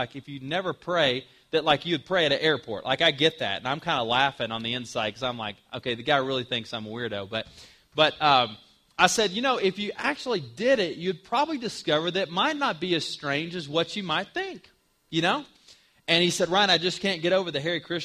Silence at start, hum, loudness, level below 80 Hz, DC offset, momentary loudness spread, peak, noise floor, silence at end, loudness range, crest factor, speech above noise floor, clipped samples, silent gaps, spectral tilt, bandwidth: 0 s; none; -25 LUFS; -64 dBFS; under 0.1%; 11 LU; -2 dBFS; -57 dBFS; 0 s; 4 LU; 24 dB; 31 dB; under 0.1%; none; -3.5 dB/octave; 15 kHz